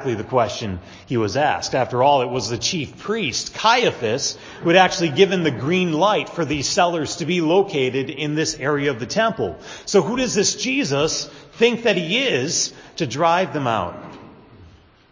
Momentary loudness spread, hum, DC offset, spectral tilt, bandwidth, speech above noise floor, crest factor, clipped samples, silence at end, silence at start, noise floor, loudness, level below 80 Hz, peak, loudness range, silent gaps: 9 LU; none; under 0.1%; -4 dB/octave; 7.6 kHz; 28 dB; 20 dB; under 0.1%; 0.45 s; 0 s; -48 dBFS; -20 LUFS; -50 dBFS; 0 dBFS; 3 LU; none